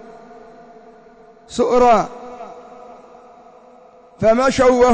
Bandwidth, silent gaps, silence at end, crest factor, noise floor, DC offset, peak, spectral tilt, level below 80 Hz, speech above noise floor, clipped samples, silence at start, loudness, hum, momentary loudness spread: 8 kHz; none; 0 s; 14 dB; -46 dBFS; under 0.1%; -4 dBFS; -5 dB/octave; -44 dBFS; 33 dB; under 0.1%; 1.5 s; -15 LUFS; none; 24 LU